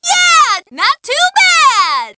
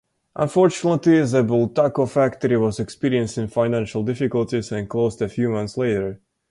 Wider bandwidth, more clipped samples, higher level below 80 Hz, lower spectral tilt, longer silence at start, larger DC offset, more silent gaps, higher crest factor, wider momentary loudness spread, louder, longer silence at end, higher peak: second, 8 kHz vs 11.5 kHz; neither; second, -58 dBFS vs -52 dBFS; second, 2.5 dB/octave vs -7 dB/octave; second, 0.05 s vs 0.35 s; neither; neither; about the same, 12 dB vs 14 dB; about the same, 7 LU vs 8 LU; first, -9 LUFS vs -21 LUFS; second, 0.05 s vs 0.35 s; first, 0 dBFS vs -6 dBFS